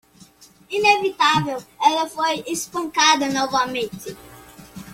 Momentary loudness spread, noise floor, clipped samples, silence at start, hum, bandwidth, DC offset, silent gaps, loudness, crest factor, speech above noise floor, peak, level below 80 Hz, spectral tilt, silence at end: 15 LU; -50 dBFS; under 0.1%; 0.4 s; none; 16.5 kHz; under 0.1%; none; -20 LUFS; 18 dB; 29 dB; -2 dBFS; -58 dBFS; -2.5 dB/octave; 0 s